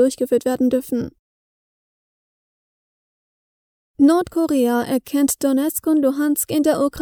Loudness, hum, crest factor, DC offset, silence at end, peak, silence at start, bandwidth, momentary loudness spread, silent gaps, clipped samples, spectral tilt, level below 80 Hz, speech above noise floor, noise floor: -19 LUFS; none; 16 dB; under 0.1%; 0 s; -4 dBFS; 0 s; over 20 kHz; 6 LU; 1.19-3.94 s; under 0.1%; -4.5 dB/octave; -54 dBFS; over 72 dB; under -90 dBFS